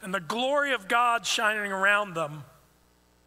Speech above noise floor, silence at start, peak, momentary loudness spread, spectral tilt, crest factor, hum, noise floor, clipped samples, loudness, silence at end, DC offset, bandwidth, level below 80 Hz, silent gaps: 36 dB; 0 s; -10 dBFS; 10 LU; -2.5 dB/octave; 18 dB; 60 Hz at -65 dBFS; -63 dBFS; under 0.1%; -25 LUFS; 0.8 s; under 0.1%; 16 kHz; -68 dBFS; none